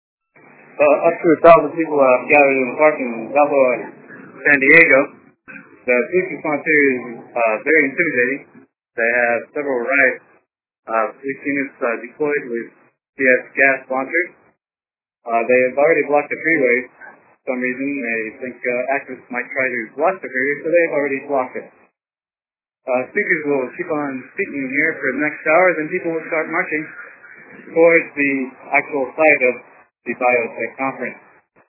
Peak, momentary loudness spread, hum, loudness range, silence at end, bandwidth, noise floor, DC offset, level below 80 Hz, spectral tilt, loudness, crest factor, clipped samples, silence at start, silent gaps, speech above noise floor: 0 dBFS; 13 LU; none; 7 LU; 0.55 s; 4 kHz; under -90 dBFS; under 0.1%; -64 dBFS; -9 dB/octave; -17 LUFS; 18 dB; under 0.1%; 0.8 s; 10.79-10.83 s, 13.09-13.13 s; over 73 dB